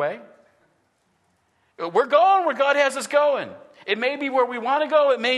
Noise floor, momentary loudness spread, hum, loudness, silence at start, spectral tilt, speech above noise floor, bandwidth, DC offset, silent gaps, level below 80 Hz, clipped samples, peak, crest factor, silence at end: -67 dBFS; 13 LU; none; -20 LUFS; 0 s; -3 dB/octave; 47 dB; 12.5 kHz; under 0.1%; none; -80 dBFS; under 0.1%; -4 dBFS; 18 dB; 0 s